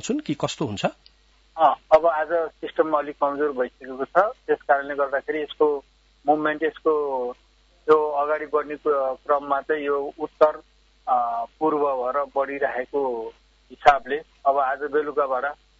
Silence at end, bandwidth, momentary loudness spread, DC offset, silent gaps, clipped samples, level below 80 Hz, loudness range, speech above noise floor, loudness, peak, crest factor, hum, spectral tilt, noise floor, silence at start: 0.25 s; 8 kHz; 10 LU; under 0.1%; none; under 0.1%; -58 dBFS; 2 LU; 22 dB; -23 LUFS; -4 dBFS; 20 dB; none; -5 dB/octave; -45 dBFS; 0.05 s